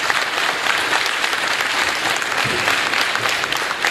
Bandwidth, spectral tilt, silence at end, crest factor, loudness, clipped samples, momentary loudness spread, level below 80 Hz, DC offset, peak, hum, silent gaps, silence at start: 16 kHz; -1 dB/octave; 0 s; 18 dB; -17 LUFS; under 0.1%; 2 LU; -54 dBFS; under 0.1%; 0 dBFS; none; none; 0 s